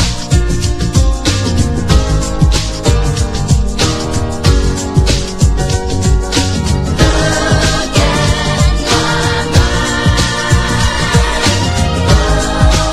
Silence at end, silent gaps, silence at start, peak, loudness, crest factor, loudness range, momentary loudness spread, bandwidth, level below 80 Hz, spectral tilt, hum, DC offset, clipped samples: 0 s; none; 0 s; 0 dBFS; -12 LUFS; 12 dB; 2 LU; 3 LU; 13.5 kHz; -16 dBFS; -4.5 dB/octave; none; under 0.1%; 0.2%